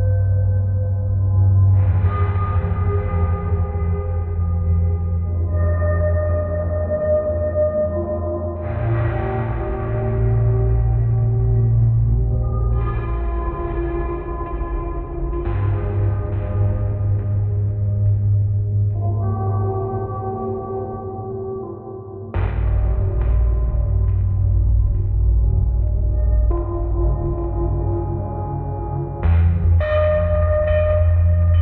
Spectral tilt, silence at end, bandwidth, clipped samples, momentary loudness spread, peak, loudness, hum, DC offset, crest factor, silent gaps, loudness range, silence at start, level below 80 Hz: -10 dB/octave; 0 s; 3.2 kHz; under 0.1%; 9 LU; -6 dBFS; -20 LUFS; none; under 0.1%; 12 dB; none; 5 LU; 0 s; -24 dBFS